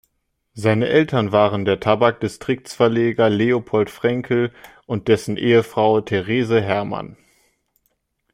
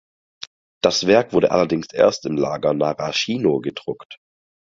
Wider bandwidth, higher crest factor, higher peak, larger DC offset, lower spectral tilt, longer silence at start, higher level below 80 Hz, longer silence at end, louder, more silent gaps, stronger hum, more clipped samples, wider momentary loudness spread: first, 15.5 kHz vs 7.6 kHz; about the same, 18 dB vs 18 dB; about the same, -2 dBFS vs -2 dBFS; neither; first, -6.5 dB/octave vs -4.5 dB/octave; second, 0.55 s vs 0.85 s; about the same, -56 dBFS vs -56 dBFS; first, 1.2 s vs 0.55 s; about the same, -19 LUFS vs -19 LUFS; second, none vs 4.05-4.10 s; neither; neither; second, 9 LU vs 19 LU